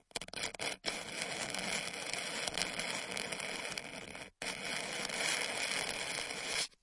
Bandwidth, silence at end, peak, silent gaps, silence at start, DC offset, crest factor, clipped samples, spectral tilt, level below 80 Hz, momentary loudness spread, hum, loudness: 11.5 kHz; 0.15 s; -10 dBFS; none; 0.15 s; under 0.1%; 28 dB; under 0.1%; -1 dB/octave; -68 dBFS; 7 LU; none; -37 LUFS